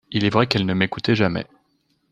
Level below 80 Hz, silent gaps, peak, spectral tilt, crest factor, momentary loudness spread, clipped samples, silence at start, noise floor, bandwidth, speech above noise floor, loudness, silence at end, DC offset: -54 dBFS; none; 0 dBFS; -6.5 dB/octave; 22 dB; 8 LU; under 0.1%; 0.1 s; -66 dBFS; 9.6 kHz; 46 dB; -20 LUFS; 0.7 s; under 0.1%